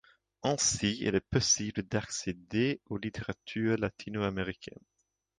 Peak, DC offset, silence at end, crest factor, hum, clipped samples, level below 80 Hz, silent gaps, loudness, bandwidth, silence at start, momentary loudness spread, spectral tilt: -14 dBFS; under 0.1%; 0.75 s; 20 dB; none; under 0.1%; -56 dBFS; none; -32 LUFS; 11 kHz; 0.45 s; 11 LU; -3.5 dB/octave